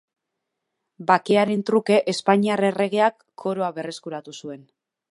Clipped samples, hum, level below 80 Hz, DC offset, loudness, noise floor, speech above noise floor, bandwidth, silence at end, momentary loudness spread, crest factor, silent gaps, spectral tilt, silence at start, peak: under 0.1%; none; -74 dBFS; under 0.1%; -21 LUFS; -81 dBFS; 59 dB; 11.5 kHz; 0.55 s; 16 LU; 20 dB; none; -5.5 dB/octave; 1 s; -2 dBFS